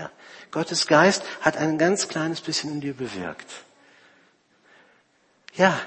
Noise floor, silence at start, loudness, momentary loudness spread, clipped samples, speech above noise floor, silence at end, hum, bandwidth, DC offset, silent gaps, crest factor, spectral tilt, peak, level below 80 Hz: -63 dBFS; 0 s; -23 LUFS; 22 LU; under 0.1%; 40 dB; 0 s; none; 8.8 kHz; under 0.1%; none; 24 dB; -4 dB/octave; -2 dBFS; -66 dBFS